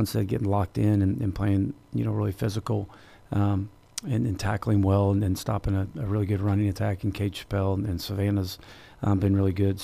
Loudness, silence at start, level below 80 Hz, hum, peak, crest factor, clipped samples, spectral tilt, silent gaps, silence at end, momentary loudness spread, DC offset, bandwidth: -27 LUFS; 0 s; -46 dBFS; none; -10 dBFS; 16 dB; under 0.1%; -7.5 dB/octave; none; 0 s; 8 LU; under 0.1%; 15 kHz